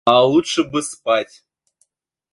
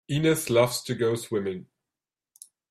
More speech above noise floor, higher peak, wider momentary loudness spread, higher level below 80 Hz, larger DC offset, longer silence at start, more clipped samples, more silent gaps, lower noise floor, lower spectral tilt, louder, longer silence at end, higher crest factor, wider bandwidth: second, 49 dB vs over 65 dB; first, 0 dBFS vs -8 dBFS; about the same, 9 LU vs 10 LU; about the same, -60 dBFS vs -62 dBFS; neither; about the same, 0.05 s vs 0.1 s; neither; neither; second, -66 dBFS vs under -90 dBFS; about the same, -4 dB/octave vs -5 dB/octave; first, -18 LUFS vs -25 LUFS; about the same, 1.1 s vs 1.1 s; about the same, 18 dB vs 18 dB; second, 11.5 kHz vs 15.5 kHz